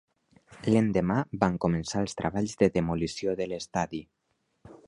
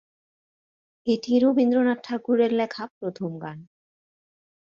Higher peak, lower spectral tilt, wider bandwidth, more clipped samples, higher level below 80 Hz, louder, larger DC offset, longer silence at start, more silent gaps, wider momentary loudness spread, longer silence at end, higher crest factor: first, -6 dBFS vs -10 dBFS; about the same, -6.5 dB/octave vs -7 dB/octave; first, 11 kHz vs 7 kHz; neither; first, -52 dBFS vs -72 dBFS; second, -28 LUFS vs -24 LUFS; neither; second, 0.5 s vs 1.05 s; second, none vs 2.90-3.01 s; second, 7 LU vs 14 LU; second, 0.1 s vs 1.1 s; first, 24 dB vs 16 dB